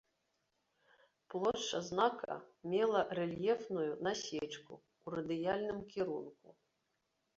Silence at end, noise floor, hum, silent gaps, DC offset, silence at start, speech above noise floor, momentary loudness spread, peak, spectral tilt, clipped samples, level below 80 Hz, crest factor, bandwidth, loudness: 0.85 s; -83 dBFS; none; none; under 0.1%; 1.3 s; 46 dB; 12 LU; -20 dBFS; -3.5 dB/octave; under 0.1%; -74 dBFS; 20 dB; 7.6 kHz; -38 LUFS